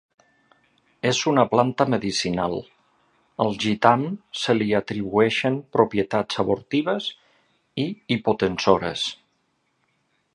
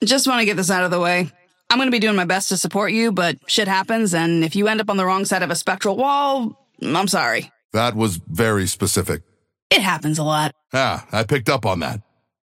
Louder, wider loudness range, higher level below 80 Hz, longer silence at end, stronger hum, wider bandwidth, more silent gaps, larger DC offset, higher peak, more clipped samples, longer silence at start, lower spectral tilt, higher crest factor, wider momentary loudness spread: second, -23 LUFS vs -19 LUFS; about the same, 3 LU vs 2 LU; about the same, -56 dBFS vs -54 dBFS; first, 1.2 s vs 0.45 s; neither; second, 11.5 kHz vs 16.5 kHz; second, none vs 7.65-7.69 s, 9.62-9.70 s; neither; about the same, 0 dBFS vs -2 dBFS; neither; first, 1.05 s vs 0 s; first, -5 dB/octave vs -3.5 dB/octave; first, 24 dB vs 18 dB; first, 10 LU vs 6 LU